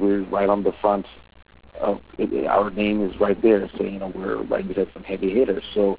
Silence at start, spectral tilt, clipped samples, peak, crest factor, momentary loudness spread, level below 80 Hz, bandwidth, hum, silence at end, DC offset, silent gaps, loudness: 0 s; -10.5 dB/octave; under 0.1%; -6 dBFS; 16 dB; 8 LU; -48 dBFS; 4 kHz; none; 0 s; 0.2%; none; -23 LUFS